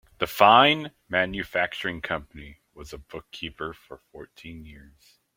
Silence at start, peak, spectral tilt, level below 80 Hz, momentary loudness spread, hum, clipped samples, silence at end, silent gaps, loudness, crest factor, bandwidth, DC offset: 0.2 s; -2 dBFS; -4.5 dB/octave; -54 dBFS; 27 LU; none; under 0.1%; 0.6 s; none; -22 LUFS; 24 dB; 16.5 kHz; under 0.1%